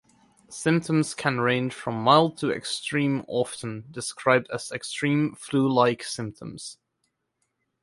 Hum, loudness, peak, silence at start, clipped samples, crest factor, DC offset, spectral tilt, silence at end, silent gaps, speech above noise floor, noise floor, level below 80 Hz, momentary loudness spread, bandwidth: none; -25 LUFS; -2 dBFS; 0.5 s; under 0.1%; 24 dB; under 0.1%; -5 dB/octave; 1.1 s; none; 52 dB; -77 dBFS; -64 dBFS; 15 LU; 11.5 kHz